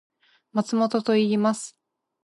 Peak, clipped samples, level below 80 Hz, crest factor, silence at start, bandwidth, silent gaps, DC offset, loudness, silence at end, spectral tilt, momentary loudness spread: -10 dBFS; under 0.1%; -74 dBFS; 16 dB; 0.55 s; 11.5 kHz; none; under 0.1%; -24 LUFS; 0.55 s; -5.5 dB/octave; 10 LU